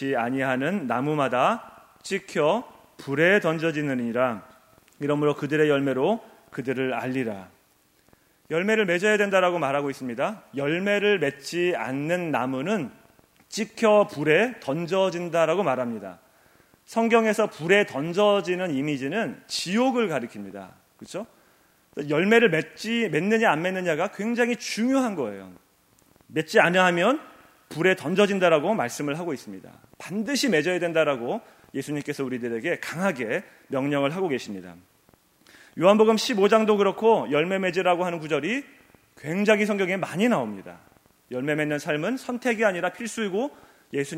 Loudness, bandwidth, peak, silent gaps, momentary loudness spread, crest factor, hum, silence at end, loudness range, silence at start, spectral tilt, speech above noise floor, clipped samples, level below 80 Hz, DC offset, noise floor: -24 LUFS; 16 kHz; -4 dBFS; none; 13 LU; 22 dB; none; 0 s; 5 LU; 0 s; -5 dB/octave; 39 dB; under 0.1%; -72 dBFS; under 0.1%; -63 dBFS